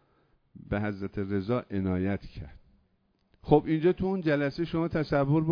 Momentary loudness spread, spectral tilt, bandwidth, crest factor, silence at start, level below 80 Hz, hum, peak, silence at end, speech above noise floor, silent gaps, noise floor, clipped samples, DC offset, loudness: 11 LU; -9.5 dB/octave; 5.4 kHz; 22 dB; 0.55 s; -50 dBFS; none; -8 dBFS; 0 s; 43 dB; none; -71 dBFS; under 0.1%; under 0.1%; -29 LUFS